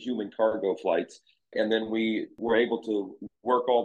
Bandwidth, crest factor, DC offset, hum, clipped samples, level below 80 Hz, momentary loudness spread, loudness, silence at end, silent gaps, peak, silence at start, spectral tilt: 8.8 kHz; 18 dB; under 0.1%; none; under 0.1%; -74 dBFS; 10 LU; -28 LUFS; 0 s; none; -10 dBFS; 0 s; -6 dB/octave